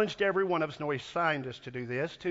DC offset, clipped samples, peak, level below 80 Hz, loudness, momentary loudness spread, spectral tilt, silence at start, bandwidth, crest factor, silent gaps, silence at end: under 0.1%; under 0.1%; -14 dBFS; -68 dBFS; -32 LUFS; 8 LU; -6 dB/octave; 0 s; 7.8 kHz; 18 dB; none; 0 s